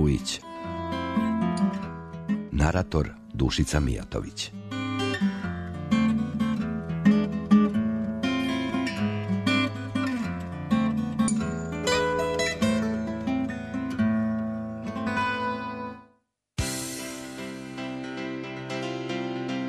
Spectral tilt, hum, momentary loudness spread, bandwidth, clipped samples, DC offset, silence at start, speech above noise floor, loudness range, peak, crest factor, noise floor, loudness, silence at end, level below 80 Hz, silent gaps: -5.5 dB/octave; none; 10 LU; 13.5 kHz; under 0.1%; under 0.1%; 0 s; 40 dB; 7 LU; -8 dBFS; 20 dB; -67 dBFS; -28 LUFS; 0 s; -42 dBFS; none